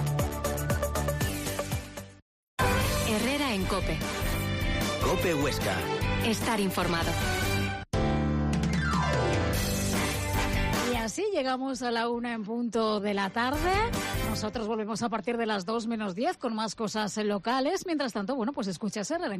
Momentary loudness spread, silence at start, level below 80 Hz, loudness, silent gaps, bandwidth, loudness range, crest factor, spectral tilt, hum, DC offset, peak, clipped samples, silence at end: 5 LU; 0 s; -40 dBFS; -29 LUFS; 2.22-2.57 s; 15.5 kHz; 2 LU; 14 dB; -5 dB/octave; none; under 0.1%; -16 dBFS; under 0.1%; 0 s